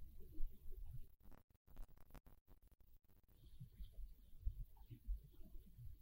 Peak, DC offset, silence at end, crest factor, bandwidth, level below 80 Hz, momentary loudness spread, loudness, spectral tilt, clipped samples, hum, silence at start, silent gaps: -30 dBFS; under 0.1%; 0 s; 22 dB; 16 kHz; -54 dBFS; 11 LU; -59 LUFS; -7 dB/octave; under 0.1%; none; 0 s; 1.44-1.48 s, 1.57-1.65 s, 2.41-2.46 s